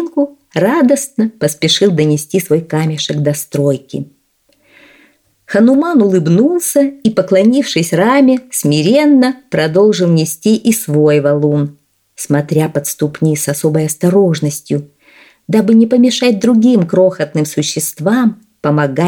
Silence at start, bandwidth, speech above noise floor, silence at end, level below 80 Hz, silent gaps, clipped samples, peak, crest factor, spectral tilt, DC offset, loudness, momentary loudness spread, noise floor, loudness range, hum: 0 s; 18.5 kHz; 45 dB; 0 s; -58 dBFS; none; under 0.1%; 0 dBFS; 12 dB; -5.5 dB/octave; under 0.1%; -12 LUFS; 7 LU; -57 dBFS; 4 LU; none